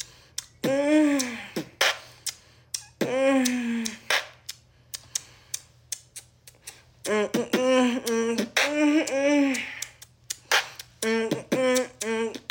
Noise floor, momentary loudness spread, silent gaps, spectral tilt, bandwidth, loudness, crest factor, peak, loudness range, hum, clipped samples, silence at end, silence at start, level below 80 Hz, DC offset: -49 dBFS; 16 LU; none; -3 dB/octave; 17 kHz; -26 LUFS; 20 dB; -8 dBFS; 8 LU; none; under 0.1%; 0.1 s; 0 s; -66 dBFS; under 0.1%